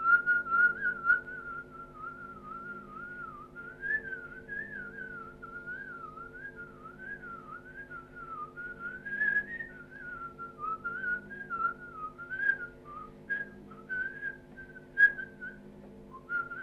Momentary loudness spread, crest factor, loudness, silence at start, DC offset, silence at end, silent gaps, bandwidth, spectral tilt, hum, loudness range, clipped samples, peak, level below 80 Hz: 20 LU; 22 dB; -33 LUFS; 0 s; under 0.1%; 0 s; none; 6 kHz; -6 dB/octave; none; 11 LU; under 0.1%; -14 dBFS; -62 dBFS